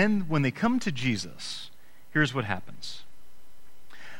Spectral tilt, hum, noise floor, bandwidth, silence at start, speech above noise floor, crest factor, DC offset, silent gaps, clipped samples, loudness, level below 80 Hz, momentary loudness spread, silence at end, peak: -5.5 dB/octave; none; -61 dBFS; 16.5 kHz; 0 s; 33 dB; 20 dB; under 0.1%; none; under 0.1%; -29 LUFS; -58 dBFS; 15 LU; 0 s; -10 dBFS